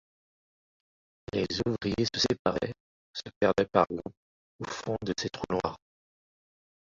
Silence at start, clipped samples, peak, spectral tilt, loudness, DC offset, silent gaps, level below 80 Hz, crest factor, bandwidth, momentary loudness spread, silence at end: 1.35 s; under 0.1%; -8 dBFS; -5 dB/octave; -30 LUFS; under 0.1%; 2.39-2.45 s, 2.80-3.14 s, 3.36-3.41 s, 4.17-4.59 s; -56 dBFS; 24 dB; 7.8 kHz; 16 LU; 1.2 s